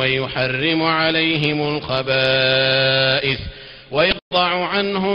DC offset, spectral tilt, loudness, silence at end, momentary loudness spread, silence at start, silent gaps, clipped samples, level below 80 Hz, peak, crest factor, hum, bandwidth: under 0.1%; -7 dB/octave; -17 LUFS; 0 s; 7 LU; 0 s; 4.22-4.31 s; under 0.1%; -44 dBFS; -4 dBFS; 14 dB; none; 6.8 kHz